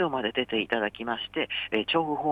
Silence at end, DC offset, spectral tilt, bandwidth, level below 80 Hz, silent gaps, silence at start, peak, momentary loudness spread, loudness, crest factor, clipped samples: 0 s; under 0.1%; -6.5 dB/octave; 8.6 kHz; -62 dBFS; none; 0 s; -10 dBFS; 4 LU; -28 LUFS; 18 dB; under 0.1%